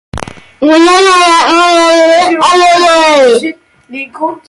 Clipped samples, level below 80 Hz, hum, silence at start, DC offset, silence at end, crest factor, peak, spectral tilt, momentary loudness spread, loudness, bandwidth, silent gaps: under 0.1%; -40 dBFS; none; 0.15 s; under 0.1%; 0.1 s; 8 dB; 0 dBFS; -2.5 dB/octave; 18 LU; -6 LUFS; 11.5 kHz; none